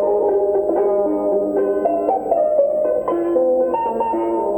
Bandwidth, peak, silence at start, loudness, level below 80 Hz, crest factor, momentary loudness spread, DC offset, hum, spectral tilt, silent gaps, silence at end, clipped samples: 16.5 kHz; -4 dBFS; 0 s; -18 LUFS; -52 dBFS; 12 dB; 3 LU; under 0.1%; none; -8.5 dB/octave; none; 0 s; under 0.1%